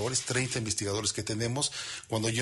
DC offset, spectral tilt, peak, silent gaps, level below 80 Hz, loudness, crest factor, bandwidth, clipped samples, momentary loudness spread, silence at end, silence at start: under 0.1%; -3 dB/octave; -16 dBFS; none; -60 dBFS; -30 LUFS; 16 dB; 11.5 kHz; under 0.1%; 3 LU; 0 s; 0 s